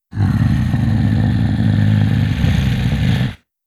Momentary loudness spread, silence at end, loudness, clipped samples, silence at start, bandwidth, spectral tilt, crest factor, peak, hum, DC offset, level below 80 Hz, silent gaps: 3 LU; 0.3 s; -16 LUFS; under 0.1%; 0.15 s; 12 kHz; -7.5 dB/octave; 12 dB; -4 dBFS; none; under 0.1%; -26 dBFS; none